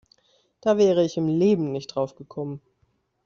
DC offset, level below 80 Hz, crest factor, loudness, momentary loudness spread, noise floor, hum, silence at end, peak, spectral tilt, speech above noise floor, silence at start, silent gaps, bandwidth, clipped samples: under 0.1%; -64 dBFS; 18 dB; -23 LUFS; 15 LU; -69 dBFS; none; 0.65 s; -8 dBFS; -7 dB/octave; 46 dB; 0.65 s; none; 7.4 kHz; under 0.1%